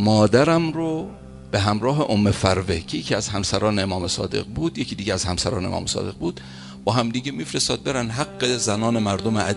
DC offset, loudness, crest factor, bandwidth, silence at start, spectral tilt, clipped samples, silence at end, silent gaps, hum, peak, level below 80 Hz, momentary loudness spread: under 0.1%; -22 LUFS; 20 dB; 11.5 kHz; 0 s; -4.5 dB/octave; under 0.1%; 0 s; none; none; -2 dBFS; -40 dBFS; 8 LU